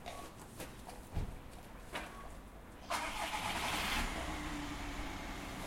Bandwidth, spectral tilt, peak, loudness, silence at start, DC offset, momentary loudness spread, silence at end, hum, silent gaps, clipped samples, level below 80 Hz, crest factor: 16.5 kHz; -3 dB/octave; -22 dBFS; -41 LUFS; 0 s; under 0.1%; 16 LU; 0 s; none; none; under 0.1%; -48 dBFS; 20 dB